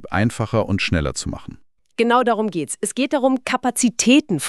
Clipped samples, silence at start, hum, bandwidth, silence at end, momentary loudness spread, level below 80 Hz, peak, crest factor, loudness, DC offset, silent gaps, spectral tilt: under 0.1%; 0 s; none; 13.5 kHz; 0 s; 10 LU; -40 dBFS; -4 dBFS; 16 dB; -19 LUFS; under 0.1%; none; -4.5 dB/octave